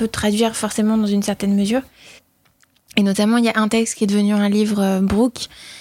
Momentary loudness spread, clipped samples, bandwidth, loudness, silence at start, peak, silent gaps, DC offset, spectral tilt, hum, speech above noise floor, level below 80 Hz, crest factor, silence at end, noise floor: 5 LU; under 0.1%; 15.5 kHz; -18 LUFS; 0 s; -2 dBFS; none; under 0.1%; -5 dB/octave; none; 41 dB; -46 dBFS; 16 dB; 0 s; -59 dBFS